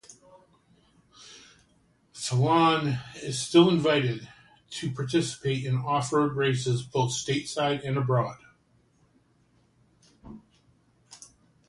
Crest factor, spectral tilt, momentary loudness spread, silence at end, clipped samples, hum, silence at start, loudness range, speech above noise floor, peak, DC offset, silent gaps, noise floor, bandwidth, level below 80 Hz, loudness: 22 dB; -5.5 dB/octave; 20 LU; 0.55 s; under 0.1%; none; 0.1 s; 7 LU; 40 dB; -6 dBFS; under 0.1%; none; -65 dBFS; 11.5 kHz; -62 dBFS; -26 LUFS